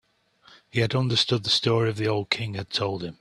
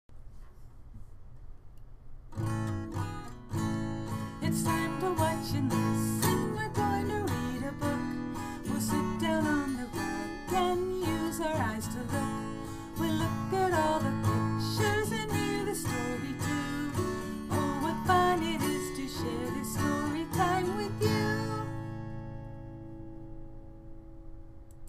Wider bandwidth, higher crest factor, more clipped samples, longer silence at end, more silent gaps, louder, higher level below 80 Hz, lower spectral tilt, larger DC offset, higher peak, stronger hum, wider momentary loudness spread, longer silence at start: second, 12 kHz vs 15.5 kHz; about the same, 20 dB vs 20 dB; neither; about the same, 0.1 s vs 0 s; neither; first, -24 LUFS vs -32 LUFS; second, -58 dBFS vs -48 dBFS; about the same, -5 dB/octave vs -5.5 dB/octave; neither; first, -6 dBFS vs -12 dBFS; neither; second, 7 LU vs 15 LU; first, 0.75 s vs 0.1 s